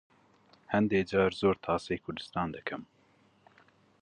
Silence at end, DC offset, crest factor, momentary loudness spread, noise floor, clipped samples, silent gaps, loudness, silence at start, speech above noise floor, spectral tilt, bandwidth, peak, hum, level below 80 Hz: 1.15 s; under 0.1%; 20 dB; 11 LU; -66 dBFS; under 0.1%; none; -31 LUFS; 0.7 s; 36 dB; -6.5 dB/octave; 9.8 kHz; -12 dBFS; none; -58 dBFS